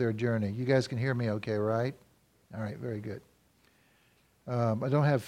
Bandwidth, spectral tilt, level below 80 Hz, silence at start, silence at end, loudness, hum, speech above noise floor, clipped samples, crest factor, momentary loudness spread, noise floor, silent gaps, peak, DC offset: 12 kHz; -7.5 dB/octave; -68 dBFS; 0 s; 0 s; -31 LUFS; none; 37 dB; under 0.1%; 18 dB; 13 LU; -67 dBFS; none; -12 dBFS; under 0.1%